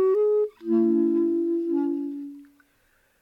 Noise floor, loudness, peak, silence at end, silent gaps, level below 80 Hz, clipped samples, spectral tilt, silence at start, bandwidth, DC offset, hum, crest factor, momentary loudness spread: -65 dBFS; -24 LUFS; -12 dBFS; 0.8 s; none; -76 dBFS; under 0.1%; -10 dB/octave; 0 s; 2.9 kHz; under 0.1%; none; 12 dB; 12 LU